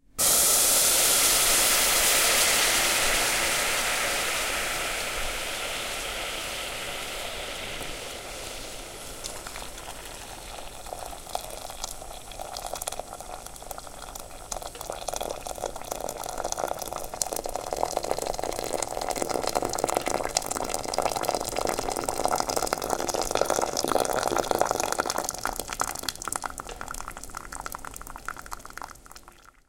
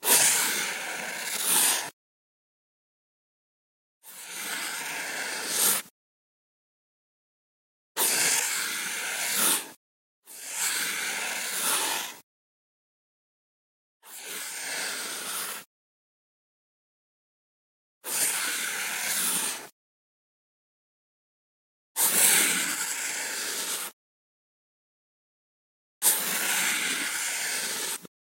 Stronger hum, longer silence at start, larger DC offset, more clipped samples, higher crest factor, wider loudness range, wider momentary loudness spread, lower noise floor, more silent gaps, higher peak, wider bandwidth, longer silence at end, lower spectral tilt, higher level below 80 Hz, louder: neither; first, 0.15 s vs 0 s; neither; neither; about the same, 26 dB vs 24 dB; first, 16 LU vs 10 LU; first, 20 LU vs 15 LU; second, -52 dBFS vs under -90 dBFS; second, none vs 1.93-4.01 s, 5.91-7.95 s, 9.76-10.23 s, 12.23-14.00 s, 15.66-18.01 s, 19.72-21.95 s, 23.93-26.01 s; first, -2 dBFS vs -6 dBFS; about the same, 17 kHz vs 16.5 kHz; about the same, 0.4 s vs 0.3 s; first, -0.5 dB/octave vs 1 dB/octave; first, -46 dBFS vs -90 dBFS; about the same, -26 LUFS vs -25 LUFS